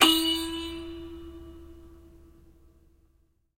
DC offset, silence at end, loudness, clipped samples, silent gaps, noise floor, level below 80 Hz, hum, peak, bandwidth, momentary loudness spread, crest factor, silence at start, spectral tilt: under 0.1%; 1.4 s; -27 LUFS; under 0.1%; none; -67 dBFS; -52 dBFS; none; -4 dBFS; 16 kHz; 26 LU; 28 dB; 0 s; -1.5 dB/octave